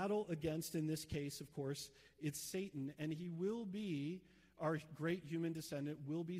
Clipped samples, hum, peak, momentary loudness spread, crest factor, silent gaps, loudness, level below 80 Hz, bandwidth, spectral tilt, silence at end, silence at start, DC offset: under 0.1%; none; -28 dBFS; 5 LU; 14 dB; none; -44 LUFS; -72 dBFS; 16 kHz; -5.5 dB/octave; 0 s; 0 s; under 0.1%